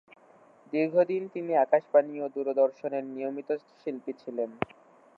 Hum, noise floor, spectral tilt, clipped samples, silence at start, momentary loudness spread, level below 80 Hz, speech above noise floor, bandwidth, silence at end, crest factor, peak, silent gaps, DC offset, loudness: none; -58 dBFS; -8.5 dB/octave; under 0.1%; 0.7 s; 12 LU; -74 dBFS; 30 dB; 5.4 kHz; 0.5 s; 20 dB; -8 dBFS; none; under 0.1%; -29 LUFS